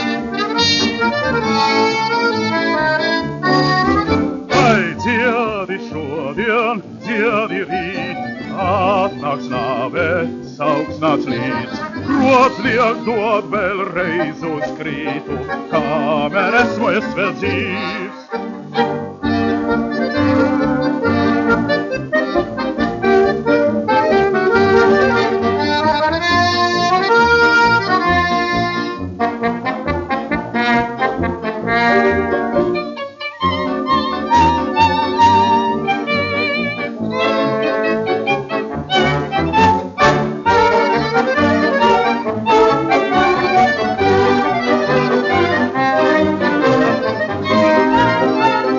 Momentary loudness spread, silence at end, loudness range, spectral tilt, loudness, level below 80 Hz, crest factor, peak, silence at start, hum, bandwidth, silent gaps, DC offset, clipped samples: 9 LU; 0 s; 5 LU; -3.5 dB/octave; -16 LUFS; -44 dBFS; 16 dB; 0 dBFS; 0 s; none; 7.4 kHz; none; under 0.1%; under 0.1%